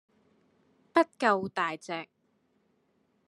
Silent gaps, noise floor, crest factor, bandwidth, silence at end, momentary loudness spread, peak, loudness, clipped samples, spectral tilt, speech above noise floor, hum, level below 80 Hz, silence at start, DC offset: none; -72 dBFS; 24 dB; 11.5 kHz; 1.25 s; 13 LU; -8 dBFS; -29 LUFS; under 0.1%; -5 dB/octave; 43 dB; none; -82 dBFS; 0.95 s; under 0.1%